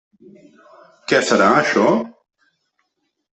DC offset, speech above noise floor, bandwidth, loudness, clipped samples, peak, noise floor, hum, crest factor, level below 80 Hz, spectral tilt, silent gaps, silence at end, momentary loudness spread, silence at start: under 0.1%; 56 dB; 8.4 kHz; -16 LUFS; under 0.1%; 0 dBFS; -72 dBFS; none; 20 dB; -62 dBFS; -4 dB/octave; none; 1.3 s; 17 LU; 1.1 s